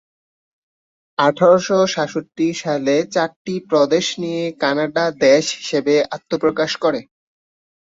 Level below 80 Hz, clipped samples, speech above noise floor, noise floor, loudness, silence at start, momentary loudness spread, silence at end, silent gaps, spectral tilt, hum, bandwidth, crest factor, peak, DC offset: -62 dBFS; under 0.1%; over 73 dB; under -90 dBFS; -18 LUFS; 1.2 s; 9 LU; 0.8 s; 3.36-3.45 s; -4.5 dB/octave; none; 8 kHz; 16 dB; -2 dBFS; under 0.1%